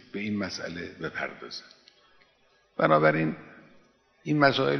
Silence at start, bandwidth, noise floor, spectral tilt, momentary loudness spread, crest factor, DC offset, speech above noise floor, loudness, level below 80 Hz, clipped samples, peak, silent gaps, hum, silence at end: 0.15 s; 6.4 kHz; -65 dBFS; -6 dB/octave; 19 LU; 24 dB; under 0.1%; 39 dB; -27 LUFS; -66 dBFS; under 0.1%; -6 dBFS; none; none; 0 s